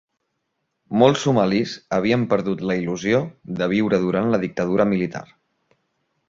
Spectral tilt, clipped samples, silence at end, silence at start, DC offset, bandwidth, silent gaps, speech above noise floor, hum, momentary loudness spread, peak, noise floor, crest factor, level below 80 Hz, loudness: -6.5 dB/octave; under 0.1%; 1.05 s; 0.9 s; under 0.1%; 7.6 kHz; none; 55 dB; none; 8 LU; -2 dBFS; -75 dBFS; 20 dB; -56 dBFS; -21 LUFS